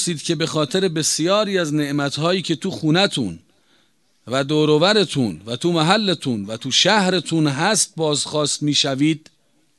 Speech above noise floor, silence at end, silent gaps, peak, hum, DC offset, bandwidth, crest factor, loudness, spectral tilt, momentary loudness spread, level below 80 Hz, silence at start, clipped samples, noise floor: 43 dB; 0.6 s; none; 0 dBFS; none; under 0.1%; 12.5 kHz; 20 dB; -19 LUFS; -4 dB/octave; 9 LU; -60 dBFS; 0 s; under 0.1%; -62 dBFS